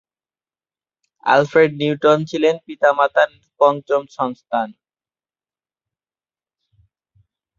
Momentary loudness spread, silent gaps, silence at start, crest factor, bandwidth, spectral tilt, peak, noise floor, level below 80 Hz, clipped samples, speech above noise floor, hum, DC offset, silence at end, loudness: 9 LU; none; 1.25 s; 18 dB; 7.4 kHz; -6 dB/octave; -2 dBFS; under -90 dBFS; -66 dBFS; under 0.1%; over 73 dB; none; under 0.1%; 2.9 s; -17 LUFS